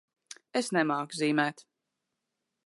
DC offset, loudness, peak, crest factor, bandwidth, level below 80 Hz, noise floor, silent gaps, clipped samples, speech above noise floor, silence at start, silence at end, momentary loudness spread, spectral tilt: under 0.1%; -30 LUFS; -10 dBFS; 22 dB; 11.5 kHz; -86 dBFS; -85 dBFS; none; under 0.1%; 56 dB; 0.55 s; 1.05 s; 16 LU; -4.5 dB/octave